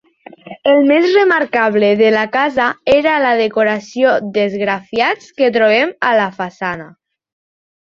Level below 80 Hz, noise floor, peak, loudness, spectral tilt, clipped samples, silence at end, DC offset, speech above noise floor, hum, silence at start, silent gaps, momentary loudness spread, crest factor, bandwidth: -56 dBFS; -37 dBFS; -2 dBFS; -14 LUFS; -5.5 dB/octave; under 0.1%; 0.95 s; under 0.1%; 23 dB; none; 0.45 s; none; 8 LU; 14 dB; 7.4 kHz